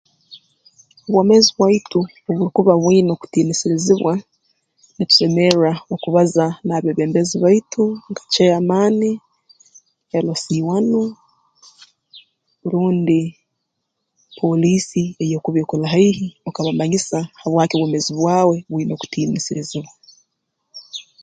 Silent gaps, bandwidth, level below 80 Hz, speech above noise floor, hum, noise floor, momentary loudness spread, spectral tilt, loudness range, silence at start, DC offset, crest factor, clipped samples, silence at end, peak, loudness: none; 9.4 kHz; -60 dBFS; 59 dB; none; -75 dBFS; 11 LU; -5.5 dB/octave; 6 LU; 0.3 s; under 0.1%; 18 dB; under 0.1%; 0.2 s; 0 dBFS; -17 LUFS